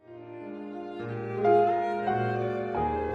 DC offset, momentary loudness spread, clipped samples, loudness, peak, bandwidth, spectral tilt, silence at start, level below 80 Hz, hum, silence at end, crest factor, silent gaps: under 0.1%; 17 LU; under 0.1%; -28 LUFS; -12 dBFS; 6.4 kHz; -8.5 dB/octave; 0.1 s; -52 dBFS; none; 0 s; 18 dB; none